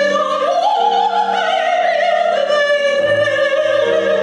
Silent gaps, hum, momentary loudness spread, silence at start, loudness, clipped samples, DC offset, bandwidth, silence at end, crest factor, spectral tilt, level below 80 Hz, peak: none; none; 2 LU; 0 s; -15 LUFS; under 0.1%; under 0.1%; 10 kHz; 0 s; 10 dB; -3 dB/octave; -60 dBFS; -6 dBFS